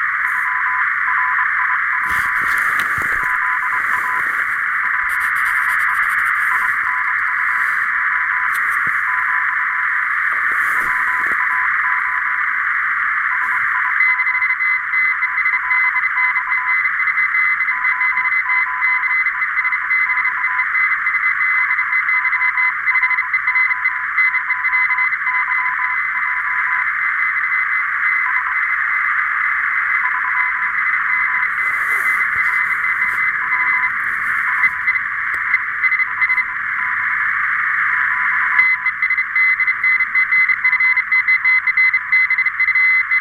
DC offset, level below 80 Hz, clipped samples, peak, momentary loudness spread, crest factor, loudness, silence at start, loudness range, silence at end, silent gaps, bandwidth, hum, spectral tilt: under 0.1%; -54 dBFS; under 0.1%; -2 dBFS; 4 LU; 16 dB; -15 LUFS; 0 s; 3 LU; 0 s; none; 16 kHz; none; -1 dB/octave